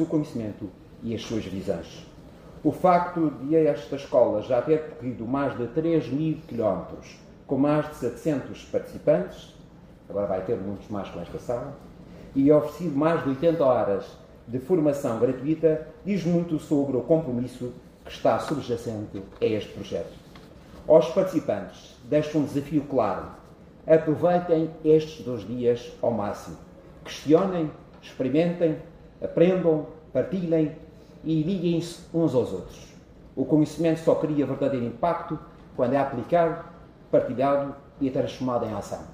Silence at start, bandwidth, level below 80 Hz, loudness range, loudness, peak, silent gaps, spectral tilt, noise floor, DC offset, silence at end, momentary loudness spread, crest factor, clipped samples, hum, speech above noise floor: 0 s; 15 kHz; -54 dBFS; 4 LU; -25 LUFS; -4 dBFS; none; -7.5 dB/octave; -48 dBFS; under 0.1%; 0 s; 15 LU; 22 dB; under 0.1%; none; 24 dB